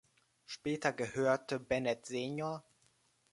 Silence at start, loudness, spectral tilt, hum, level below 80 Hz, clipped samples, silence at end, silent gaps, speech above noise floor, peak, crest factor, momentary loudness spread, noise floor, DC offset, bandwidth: 0.5 s; -36 LUFS; -5 dB/octave; none; -70 dBFS; under 0.1%; 0.7 s; none; 37 dB; -16 dBFS; 22 dB; 9 LU; -73 dBFS; under 0.1%; 11.5 kHz